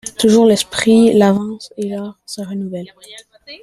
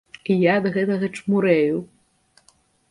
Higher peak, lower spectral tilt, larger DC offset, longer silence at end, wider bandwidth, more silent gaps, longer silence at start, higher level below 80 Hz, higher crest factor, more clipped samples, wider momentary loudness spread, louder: about the same, -2 dBFS vs -4 dBFS; second, -5 dB/octave vs -7.5 dB/octave; neither; second, 0.05 s vs 1.05 s; first, 13.5 kHz vs 11 kHz; neither; second, 0.05 s vs 0.3 s; first, -54 dBFS vs -64 dBFS; about the same, 14 dB vs 18 dB; neither; first, 18 LU vs 6 LU; first, -14 LUFS vs -21 LUFS